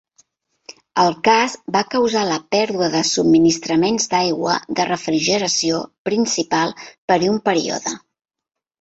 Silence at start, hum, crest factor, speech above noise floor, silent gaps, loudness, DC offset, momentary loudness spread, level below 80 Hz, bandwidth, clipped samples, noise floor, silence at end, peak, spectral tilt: 0.7 s; none; 18 dB; 41 dB; 5.98-6.05 s, 6.98-7.08 s; -18 LUFS; under 0.1%; 8 LU; -58 dBFS; 8.2 kHz; under 0.1%; -59 dBFS; 0.85 s; -2 dBFS; -3.5 dB/octave